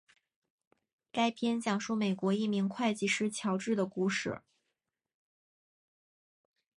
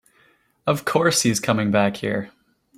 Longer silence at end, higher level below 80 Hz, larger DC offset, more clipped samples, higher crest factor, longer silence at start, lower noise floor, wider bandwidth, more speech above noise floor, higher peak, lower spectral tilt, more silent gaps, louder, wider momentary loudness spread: first, 2.4 s vs 0.5 s; second, -76 dBFS vs -58 dBFS; neither; neither; about the same, 18 dB vs 18 dB; first, 1.15 s vs 0.65 s; first, -87 dBFS vs -60 dBFS; second, 11.5 kHz vs 16 kHz; first, 55 dB vs 39 dB; second, -18 dBFS vs -4 dBFS; about the same, -5 dB/octave vs -4 dB/octave; neither; second, -33 LUFS vs -21 LUFS; second, 4 LU vs 11 LU